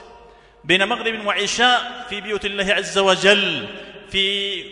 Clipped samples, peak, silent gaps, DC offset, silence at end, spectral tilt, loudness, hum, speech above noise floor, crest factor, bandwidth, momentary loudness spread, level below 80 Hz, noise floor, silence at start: under 0.1%; 0 dBFS; none; under 0.1%; 0 s; -2.5 dB/octave; -18 LUFS; none; 27 dB; 20 dB; 11 kHz; 13 LU; -50 dBFS; -47 dBFS; 0 s